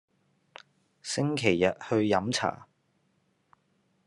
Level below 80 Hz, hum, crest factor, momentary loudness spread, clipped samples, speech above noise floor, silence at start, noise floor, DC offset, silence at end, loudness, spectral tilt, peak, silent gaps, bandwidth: -72 dBFS; none; 24 dB; 11 LU; under 0.1%; 45 dB; 1.05 s; -72 dBFS; under 0.1%; 1.45 s; -28 LUFS; -5 dB/octave; -8 dBFS; none; 12 kHz